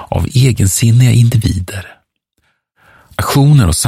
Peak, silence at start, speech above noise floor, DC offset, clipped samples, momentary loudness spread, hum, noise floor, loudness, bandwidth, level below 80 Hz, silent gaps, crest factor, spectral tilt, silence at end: 0 dBFS; 0 s; 53 dB; under 0.1%; under 0.1%; 15 LU; none; -63 dBFS; -11 LUFS; 15.5 kHz; -30 dBFS; none; 12 dB; -5.5 dB/octave; 0 s